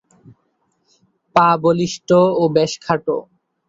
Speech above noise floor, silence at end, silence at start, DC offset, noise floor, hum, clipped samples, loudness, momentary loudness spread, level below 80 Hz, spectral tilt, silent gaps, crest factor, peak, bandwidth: 51 dB; 0.45 s; 1.35 s; under 0.1%; -66 dBFS; none; under 0.1%; -17 LUFS; 7 LU; -58 dBFS; -6 dB/octave; none; 16 dB; -2 dBFS; 8 kHz